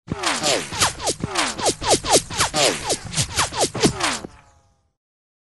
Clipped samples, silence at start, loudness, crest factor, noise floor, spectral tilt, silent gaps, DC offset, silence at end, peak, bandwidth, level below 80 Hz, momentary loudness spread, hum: under 0.1%; 0.1 s; -20 LUFS; 20 dB; -58 dBFS; -2 dB/octave; none; 0.2%; 1.1 s; -2 dBFS; 12 kHz; -44 dBFS; 6 LU; none